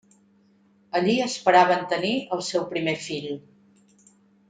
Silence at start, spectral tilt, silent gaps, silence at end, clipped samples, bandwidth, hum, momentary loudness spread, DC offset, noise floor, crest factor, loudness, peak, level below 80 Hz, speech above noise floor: 0.95 s; -4 dB/octave; none; 1.1 s; under 0.1%; 9.4 kHz; none; 13 LU; under 0.1%; -60 dBFS; 20 dB; -23 LUFS; -4 dBFS; -70 dBFS; 37 dB